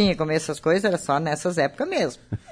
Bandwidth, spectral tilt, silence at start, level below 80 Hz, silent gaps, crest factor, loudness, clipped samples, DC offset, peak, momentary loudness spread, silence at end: 11 kHz; -5 dB/octave; 0 s; -52 dBFS; none; 16 dB; -23 LUFS; under 0.1%; under 0.1%; -8 dBFS; 4 LU; 0 s